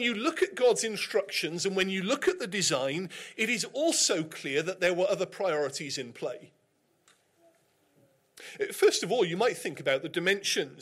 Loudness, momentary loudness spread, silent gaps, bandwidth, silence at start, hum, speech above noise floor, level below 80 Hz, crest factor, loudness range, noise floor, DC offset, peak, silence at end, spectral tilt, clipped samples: -29 LUFS; 10 LU; none; 16 kHz; 0 s; none; 42 dB; -74 dBFS; 16 dB; 6 LU; -71 dBFS; under 0.1%; -14 dBFS; 0 s; -2.5 dB/octave; under 0.1%